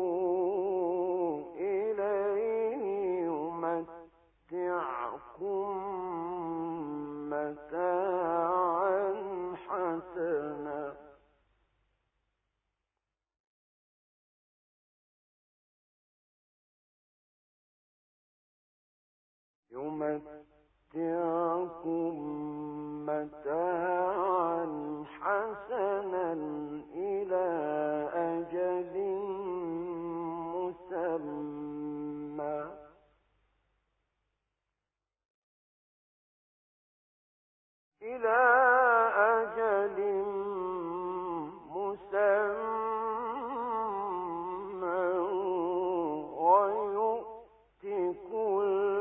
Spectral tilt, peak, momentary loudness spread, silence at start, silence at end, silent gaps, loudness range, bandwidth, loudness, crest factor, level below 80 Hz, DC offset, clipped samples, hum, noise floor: 0 dB/octave; -12 dBFS; 11 LU; 0 s; 0 s; 13.40-19.63 s, 35.30-37.92 s; 13 LU; 3.8 kHz; -32 LUFS; 22 dB; -70 dBFS; under 0.1%; under 0.1%; none; under -90 dBFS